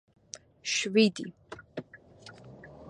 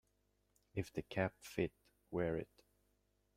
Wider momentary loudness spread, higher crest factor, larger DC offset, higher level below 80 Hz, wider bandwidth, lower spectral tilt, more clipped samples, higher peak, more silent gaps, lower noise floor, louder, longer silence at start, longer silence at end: first, 25 LU vs 6 LU; about the same, 22 dB vs 22 dB; neither; about the same, -68 dBFS vs -68 dBFS; second, 10.5 kHz vs 16.5 kHz; second, -3.5 dB/octave vs -6.5 dB/octave; neither; first, -10 dBFS vs -22 dBFS; neither; second, -53 dBFS vs -80 dBFS; first, -27 LUFS vs -43 LUFS; about the same, 0.65 s vs 0.75 s; second, 0 s vs 0.95 s